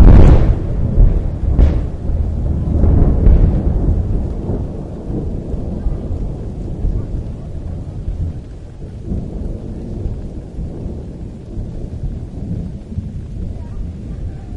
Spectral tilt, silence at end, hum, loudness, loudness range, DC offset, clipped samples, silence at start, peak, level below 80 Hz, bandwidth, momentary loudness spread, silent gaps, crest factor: -10 dB/octave; 0 s; none; -19 LUFS; 11 LU; under 0.1%; under 0.1%; 0 s; 0 dBFS; -16 dBFS; 4.7 kHz; 15 LU; none; 14 dB